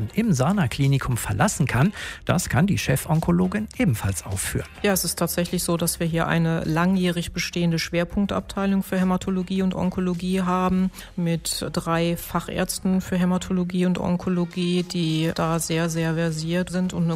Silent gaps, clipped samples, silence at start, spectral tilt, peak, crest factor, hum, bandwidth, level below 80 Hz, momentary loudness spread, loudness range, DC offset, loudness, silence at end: none; under 0.1%; 0 s; -5.5 dB/octave; -4 dBFS; 18 dB; none; 16 kHz; -42 dBFS; 5 LU; 2 LU; under 0.1%; -23 LUFS; 0 s